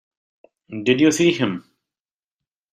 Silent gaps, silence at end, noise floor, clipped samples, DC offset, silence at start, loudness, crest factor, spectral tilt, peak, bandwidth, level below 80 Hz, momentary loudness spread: none; 1.15 s; under -90 dBFS; under 0.1%; under 0.1%; 0.7 s; -18 LUFS; 18 dB; -4.5 dB/octave; -4 dBFS; 14.5 kHz; -62 dBFS; 17 LU